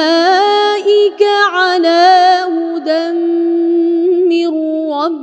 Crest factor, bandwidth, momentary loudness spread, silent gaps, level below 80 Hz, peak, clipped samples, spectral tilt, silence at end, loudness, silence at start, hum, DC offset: 12 dB; 8.4 kHz; 8 LU; none; -70 dBFS; 0 dBFS; under 0.1%; -1.5 dB/octave; 0 s; -11 LUFS; 0 s; none; under 0.1%